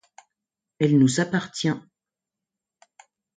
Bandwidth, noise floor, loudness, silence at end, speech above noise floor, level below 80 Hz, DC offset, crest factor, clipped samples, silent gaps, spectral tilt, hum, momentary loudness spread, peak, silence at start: 9.4 kHz; -88 dBFS; -23 LUFS; 1.55 s; 67 dB; -66 dBFS; under 0.1%; 18 dB; under 0.1%; none; -5.5 dB/octave; none; 8 LU; -8 dBFS; 0.8 s